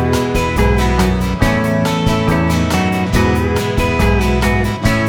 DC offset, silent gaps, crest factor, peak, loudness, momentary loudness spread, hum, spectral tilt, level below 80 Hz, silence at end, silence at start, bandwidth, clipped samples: under 0.1%; none; 14 dB; 0 dBFS; -15 LUFS; 2 LU; none; -6 dB/octave; -22 dBFS; 0 s; 0 s; over 20 kHz; under 0.1%